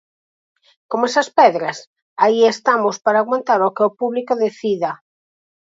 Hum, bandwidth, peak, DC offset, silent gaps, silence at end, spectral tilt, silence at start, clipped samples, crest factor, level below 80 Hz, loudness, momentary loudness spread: none; 7.8 kHz; 0 dBFS; under 0.1%; 1.87-1.96 s, 2.02-2.16 s; 0.8 s; -4 dB/octave; 0.9 s; under 0.1%; 18 dB; -74 dBFS; -17 LUFS; 12 LU